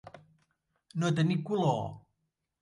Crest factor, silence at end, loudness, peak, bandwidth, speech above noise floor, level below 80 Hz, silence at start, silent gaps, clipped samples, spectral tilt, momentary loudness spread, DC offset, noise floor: 18 dB; 0.65 s; -31 LUFS; -16 dBFS; 11 kHz; 53 dB; -68 dBFS; 0.05 s; none; under 0.1%; -7 dB/octave; 12 LU; under 0.1%; -82 dBFS